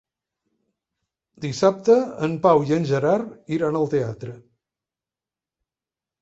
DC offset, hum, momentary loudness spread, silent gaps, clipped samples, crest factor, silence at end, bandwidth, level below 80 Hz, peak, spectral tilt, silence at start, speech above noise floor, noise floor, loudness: under 0.1%; none; 13 LU; none; under 0.1%; 20 dB; 1.85 s; 8 kHz; -62 dBFS; -4 dBFS; -7 dB/octave; 1.4 s; 69 dB; -90 dBFS; -21 LUFS